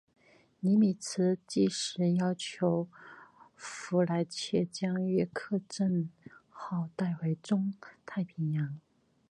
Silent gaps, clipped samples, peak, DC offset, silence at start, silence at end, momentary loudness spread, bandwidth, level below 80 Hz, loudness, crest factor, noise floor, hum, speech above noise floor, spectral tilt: none; under 0.1%; -14 dBFS; under 0.1%; 0.65 s; 0.5 s; 13 LU; 11.5 kHz; -74 dBFS; -32 LUFS; 18 dB; -55 dBFS; none; 24 dB; -6 dB/octave